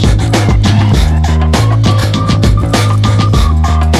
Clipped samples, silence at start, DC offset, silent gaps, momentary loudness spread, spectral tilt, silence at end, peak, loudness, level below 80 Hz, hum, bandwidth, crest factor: under 0.1%; 0 s; under 0.1%; none; 1 LU; -6 dB/octave; 0 s; 0 dBFS; -10 LUFS; -14 dBFS; none; 13 kHz; 8 dB